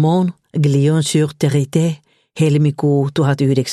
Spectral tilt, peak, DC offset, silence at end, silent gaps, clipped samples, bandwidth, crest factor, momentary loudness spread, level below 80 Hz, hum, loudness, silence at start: -6.5 dB/octave; -2 dBFS; under 0.1%; 0 s; none; under 0.1%; 12.5 kHz; 14 dB; 4 LU; -56 dBFS; none; -16 LUFS; 0 s